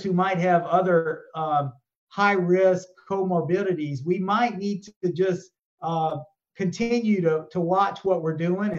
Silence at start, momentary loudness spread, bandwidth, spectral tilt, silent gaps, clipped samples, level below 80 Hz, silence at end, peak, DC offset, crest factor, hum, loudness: 0 s; 10 LU; 7.8 kHz; -7 dB/octave; 1.97-2.07 s, 4.96-5.01 s, 5.65-5.78 s; under 0.1%; -66 dBFS; 0 s; -6 dBFS; under 0.1%; 18 dB; none; -24 LUFS